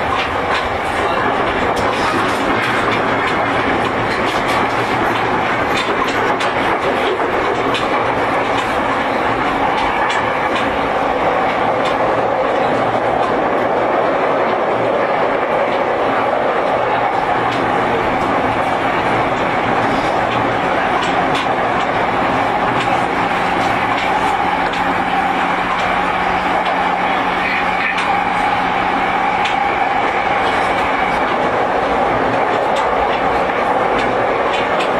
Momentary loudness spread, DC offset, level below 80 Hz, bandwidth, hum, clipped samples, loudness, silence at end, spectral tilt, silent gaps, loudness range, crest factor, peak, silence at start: 1 LU; under 0.1%; -40 dBFS; 14 kHz; none; under 0.1%; -16 LUFS; 0 s; -5 dB/octave; none; 0 LU; 12 dB; -4 dBFS; 0 s